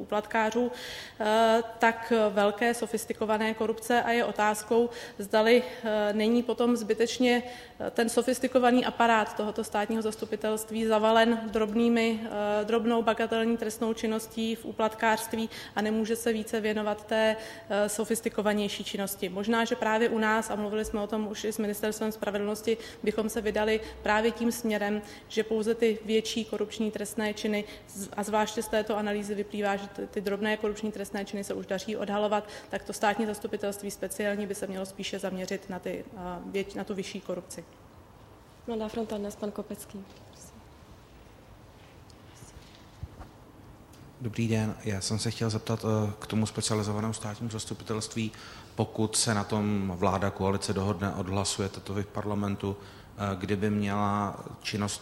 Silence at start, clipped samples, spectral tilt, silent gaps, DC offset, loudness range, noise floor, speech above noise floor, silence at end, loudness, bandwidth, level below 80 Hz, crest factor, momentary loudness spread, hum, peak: 0 s; under 0.1%; -4.5 dB/octave; none; under 0.1%; 10 LU; -53 dBFS; 24 dB; 0 s; -29 LUFS; 16 kHz; -58 dBFS; 22 dB; 11 LU; none; -8 dBFS